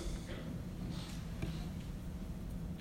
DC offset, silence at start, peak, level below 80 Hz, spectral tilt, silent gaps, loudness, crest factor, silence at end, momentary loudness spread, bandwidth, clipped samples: under 0.1%; 0 s; -26 dBFS; -46 dBFS; -6 dB/octave; none; -44 LUFS; 16 dB; 0 s; 3 LU; 16 kHz; under 0.1%